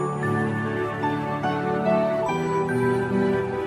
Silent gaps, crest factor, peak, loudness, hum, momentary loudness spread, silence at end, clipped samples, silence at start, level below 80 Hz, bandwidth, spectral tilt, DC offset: none; 12 dB; -12 dBFS; -24 LUFS; none; 4 LU; 0 s; under 0.1%; 0 s; -54 dBFS; 13 kHz; -7.5 dB/octave; under 0.1%